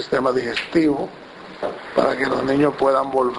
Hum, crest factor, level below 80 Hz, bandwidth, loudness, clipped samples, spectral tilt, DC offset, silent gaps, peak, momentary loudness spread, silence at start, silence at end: none; 20 dB; -52 dBFS; 11 kHz; -20 LUFS; under 0.1%; -6 dB/octave; under 0.1%; none; 0 dBFS; 12 LU; 0 s; 0 s